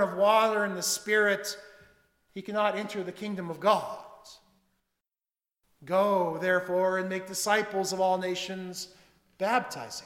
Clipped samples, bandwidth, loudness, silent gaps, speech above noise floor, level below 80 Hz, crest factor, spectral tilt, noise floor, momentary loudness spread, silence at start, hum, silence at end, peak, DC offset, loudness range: under 0.1%; 17 kHz; -28 LUFS; none; over 62 dB; -74 dBFS; 20 dB; -3.5 dB/octave; under -90 dBFS; 15 LU; 0 s; none; 0 s; -10 dBFS; under 0.1%; 4 LU